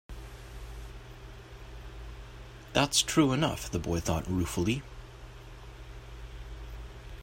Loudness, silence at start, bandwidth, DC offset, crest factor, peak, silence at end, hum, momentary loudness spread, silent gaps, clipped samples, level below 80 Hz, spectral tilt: -29 LUFS; 0.1 s; 16 kHz; under 0.1%; 22 dB; -10 dBFS; 0 s; none; 23 LU; none; under 0.1%; -46 dBFS; -4 dB/octave